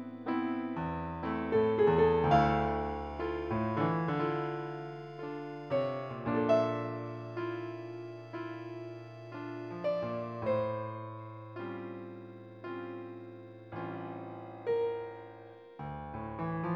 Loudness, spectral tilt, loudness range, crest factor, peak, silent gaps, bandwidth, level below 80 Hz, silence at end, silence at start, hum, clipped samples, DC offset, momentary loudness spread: -34 LUFS; -8.5 dB/octave; 11 LU; 20 dB; -14 dBFS; none; 6.8 kHz; -54 dBFS; 0 s; 0 s; none; under 0.1%; under 0.1%; 18 LU